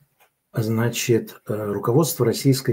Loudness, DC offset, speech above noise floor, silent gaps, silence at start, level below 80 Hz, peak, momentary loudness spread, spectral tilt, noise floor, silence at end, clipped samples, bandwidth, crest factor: -22 LUFS; under 0.1%; 42 dB; none; 0.55 s; -64 dBFS; -6 dBFS; 9 LU; -5.5 dB/octave; -63 dBFS; 0 s; under 0.1%; 16.5 kHz; 16 dB